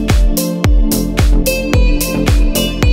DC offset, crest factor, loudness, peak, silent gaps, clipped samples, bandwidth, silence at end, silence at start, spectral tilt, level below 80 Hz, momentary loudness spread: under 0.1%; 10 dB; -14 LUFS; 0 dBFS; none; under 0.1%; 16.5 kHz; 0 s; 0 s; -5 dB/octave; -14 dBFS; 2 LU